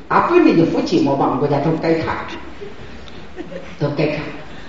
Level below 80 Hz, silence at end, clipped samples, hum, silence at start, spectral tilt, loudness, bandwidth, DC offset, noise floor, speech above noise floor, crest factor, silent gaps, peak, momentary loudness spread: -44 dBFS; 0 s; under 0.1%; none; 0 s; -6 dB/octave; -17 LUFS; 7.6 kHz; 2%; -36 dBFS; 20 dB; 18 dB; none; 0 dBFS; 22 LU